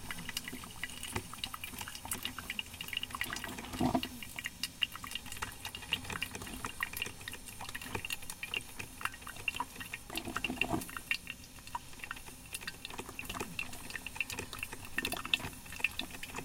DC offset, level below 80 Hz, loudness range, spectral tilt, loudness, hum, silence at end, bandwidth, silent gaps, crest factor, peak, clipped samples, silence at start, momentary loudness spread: under 0.1%; -56 dBFS; 3 LU; -2.5 dB/octave; -39 LUFS; none; 0 s; 17 kHz; none; 30 dB; -10 dBFS; under 0.1%; 0 s; 9 LU